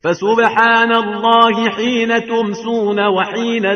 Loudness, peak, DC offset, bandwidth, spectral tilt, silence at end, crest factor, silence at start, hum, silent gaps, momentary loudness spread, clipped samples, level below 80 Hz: -14 LUFS; 0 dBFS; under 0.1%; 6.6 kHz; -4.5 dB/octave; 0 s; 14 dB; 0.05 s; none; none; 7 LU; under 0.1%; -60 dBFS